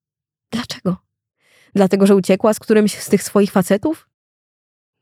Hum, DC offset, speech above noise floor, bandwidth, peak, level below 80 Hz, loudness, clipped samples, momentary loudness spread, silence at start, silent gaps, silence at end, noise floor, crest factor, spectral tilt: none; under 0.1%; 72 dB; 16 kHz; -2 dBFS; -58 dBFS; -16 LUFS; under 0.1%; 13 LU; 0.5 s; none; 1.05 s; -87 dBFS; 16 dB; -6 dB/octave